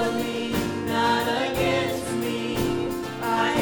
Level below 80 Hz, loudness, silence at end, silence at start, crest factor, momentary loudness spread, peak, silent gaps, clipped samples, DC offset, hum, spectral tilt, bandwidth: -48 dBFS; -25 LUFS; 0 s; 0 s; 14 dB; 5 LU; -10 dBFS; none; under 0.1%; under 0.1%; none; -4.5 dB/octave; over 20 kHz